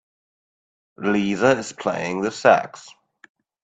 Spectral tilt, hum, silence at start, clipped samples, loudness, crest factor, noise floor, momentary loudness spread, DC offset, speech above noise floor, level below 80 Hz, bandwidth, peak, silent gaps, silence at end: -5 dB/octave; none; 1 s; under 0.1%; -21 LUFS; 22 dB; under -90 dBFS; 9 LU; under 0.1%; over 70 dB; -62 dBFS; 9.2 kHz; 0 dBFS; none; 0.75 s